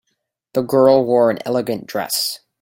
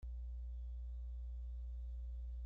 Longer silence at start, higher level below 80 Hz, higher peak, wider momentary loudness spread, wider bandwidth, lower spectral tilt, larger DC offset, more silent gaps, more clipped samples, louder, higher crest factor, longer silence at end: first, 0.55 s vs 0 s; second, -62 dBFS vs -46 dBFS; first, 0 dBFS vs -42 dBFS; first, 11 LU vs 0 LU; first, 17 kHz vs 0.8 kHz; second, -4.5 dB/octave vs -10 dB/octave; neither; neither; neither; first, -17 LUFS vs -49 LUFS; first, 16 dB vs 4 dB; first, 0.25 s vs 0 s